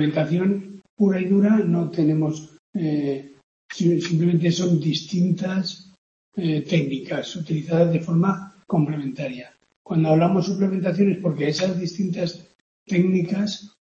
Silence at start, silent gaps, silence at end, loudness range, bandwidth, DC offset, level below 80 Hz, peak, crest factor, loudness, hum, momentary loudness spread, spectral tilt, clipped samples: 0 s; 0.90-0.97 s, 2.59-2.73 s, 3.43-3.69 s, 5.98-6.32 s, 9.76-9.85 s, 12.55-12.86 s; 0.15 s; 2 LU; 7.4 kHz; under 0.1%; -64 dBFS; -6 dBFS; 16 dB; -22 LUFS; none; 11 LU; -7 dB/octave; under 0.1%